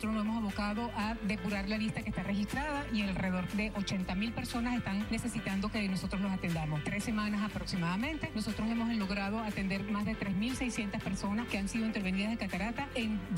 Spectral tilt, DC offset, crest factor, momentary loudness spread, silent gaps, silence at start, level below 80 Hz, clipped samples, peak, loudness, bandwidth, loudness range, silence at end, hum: -5.5 dB/octave; under 0.1%; 12 dB; 2 LU; none; 0 s; -48 dBFS; under 0.1%; -22 dBFS; -35 LUFS; 16 kHz; 0 LU; 0 s; none